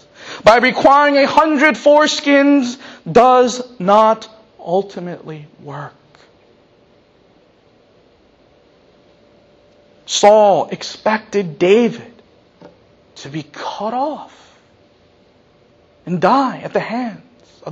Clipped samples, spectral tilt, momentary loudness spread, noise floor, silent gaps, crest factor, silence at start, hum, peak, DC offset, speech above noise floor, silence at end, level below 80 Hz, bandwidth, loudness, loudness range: under 0.1%; -4.5 dB/octave; 21 LU; -52 dBFS; none; 16 dB; 0.2 s; none; 0 dBFS; under 0.1%; 38 dB; 0 s; -54 dBFS; 8.6 kHz; -14 LUFS; 16 LU